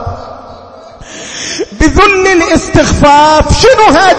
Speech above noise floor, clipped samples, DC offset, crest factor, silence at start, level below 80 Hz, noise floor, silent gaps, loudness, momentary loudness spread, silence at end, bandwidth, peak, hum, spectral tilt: 25 dB; 1%; under 0.1%; 8 dB; 0 s; -20 dBFS; -31 dBFS; none; -6 LUFS; 20 LU; 0 s; 11 kHz; 0 dBFS; none; -4.5 dB/octave